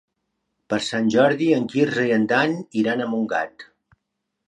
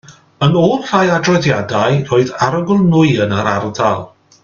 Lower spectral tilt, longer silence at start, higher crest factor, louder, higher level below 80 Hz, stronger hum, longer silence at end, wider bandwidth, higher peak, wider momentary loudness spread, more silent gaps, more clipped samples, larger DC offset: about the same, -5.5 dB/octave vs -6.5 dB/octave; first, 0.7 s vs 0.1 s; about the same, 18 dB vs 14 dB; second, -21 LUFS vs -14 LUFS; second, -66 dBFS vs -48 dBFS; neither; first, 0.85 s vs 0.35 s; first, 10.5 kHz vs 7.4 kHz; second, -4 dBFS vs 0 dBFS; first, 8 LU vs 5 LU; neither; neither; neither